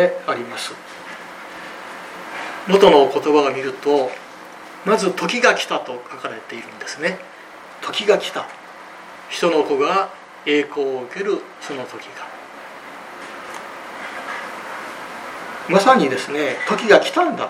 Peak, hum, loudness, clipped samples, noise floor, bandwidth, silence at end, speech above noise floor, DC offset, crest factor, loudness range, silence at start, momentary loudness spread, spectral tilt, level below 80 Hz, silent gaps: 0 dBFS; none; -19 LUFS; under 0.1%; -39 dBFS; 15 kHz; 0 s; 21 dB; under 0.1%; 20 dB; 13 LU; 0 s; 21 LU; -4 dB/octave; -62 dBFS; none